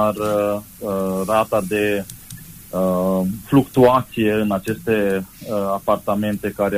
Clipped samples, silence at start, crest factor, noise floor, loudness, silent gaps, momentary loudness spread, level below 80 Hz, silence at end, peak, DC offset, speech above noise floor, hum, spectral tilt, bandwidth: under 0.1%; 0 s; 16 dB; -38 dBFS; -20 LUFS; none; 11 LU; -48 dBFS; 0 s; -2 dBFS; under 0.1%; 19 dB; none; -6.5 dB/octave; 15.5 kHz